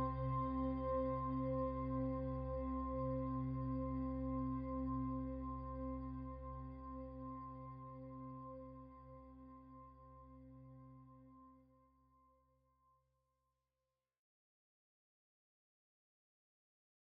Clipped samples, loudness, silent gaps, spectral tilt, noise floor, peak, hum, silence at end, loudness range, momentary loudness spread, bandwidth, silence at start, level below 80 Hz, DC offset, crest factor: under 0.1%; -44 LUFS; none; -10 dB/octave; under -90 dBFS; -28 dBFS; none; 5.5 s; 21 LU; 20 LU; 5 kHz; 0 s; -54 dBFS; under 0.1%; 18 dB